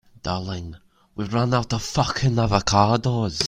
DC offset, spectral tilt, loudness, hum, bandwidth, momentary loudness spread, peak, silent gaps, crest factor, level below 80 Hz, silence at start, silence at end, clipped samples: under 0.1%; -5 dB/octave; -22 LUFS; none; 13.5 kHz; 15 LU; -2 dBFS; none; 22 dB; -42 dBFS; 0.25 s; 0 s; under 0.1%